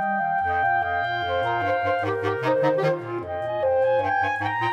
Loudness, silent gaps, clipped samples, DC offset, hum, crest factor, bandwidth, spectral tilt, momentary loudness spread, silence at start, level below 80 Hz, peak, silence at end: -23 LUFS; none; under 0.1%; under 0.1%; none; 14 dB; 8.4 kHz; -6.5 dB/octave; 4 LU; 0 s; -58 dBFS; -10 dBFS; 0 s